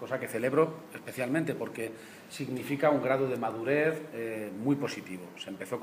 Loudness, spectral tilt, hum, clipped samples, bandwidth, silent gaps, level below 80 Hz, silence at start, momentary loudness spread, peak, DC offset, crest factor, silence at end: -31 LUFS; -6 dB/octave; none; under 0.1%; 15.5 kHz; none; -76 dBFS; 0 s; 14 LU; -12 dBFS; under 0.1%; 20 dB; 0 s